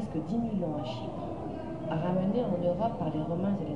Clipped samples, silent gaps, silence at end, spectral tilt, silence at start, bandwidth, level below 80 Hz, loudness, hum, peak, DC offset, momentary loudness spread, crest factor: under 0.1%; none; 0 s; -9 dB/octave; 0 s; 7.8 kHz; -54 dBFS; -32 LUFS; none; -18 dBFS; 0.3%; 8 LU; 14 dB